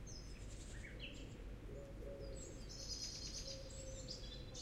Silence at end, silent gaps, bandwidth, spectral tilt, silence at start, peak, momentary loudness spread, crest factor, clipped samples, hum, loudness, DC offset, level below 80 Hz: 0 s; none; 15.5 kHz; -3.5 dB/octave; 0 s; -32 dBFS; 8 LU; 18 dB; under 0.1%; none; -51 LUFS; under 0.1%; -54 dBFS